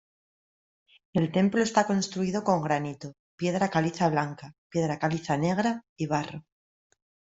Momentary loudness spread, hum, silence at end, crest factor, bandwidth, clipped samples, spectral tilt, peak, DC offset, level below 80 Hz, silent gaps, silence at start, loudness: 12 LU; none; 0.9 s; 20 dB; 8 kHz; under 0.1%; -6 dB/octave; -8 dBFS; under 0.1%; -64 dBFS; 3.19-3.38 s, 4.58-4.70 s, 5.89-5.96 s; 1.15 s; -28 LUFS